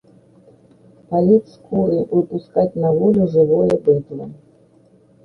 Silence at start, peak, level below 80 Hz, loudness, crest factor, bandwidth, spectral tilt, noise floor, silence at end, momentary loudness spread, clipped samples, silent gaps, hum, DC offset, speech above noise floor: 1.1 s; -2 dBFS; -52 dBFS; -17 LUFS; 16 dB; 6 kHz; -11 dB/octave; -52 dBFS; 0.9 s; 9 LU; under 0.1%; none; none; under 0.1%; 36 dB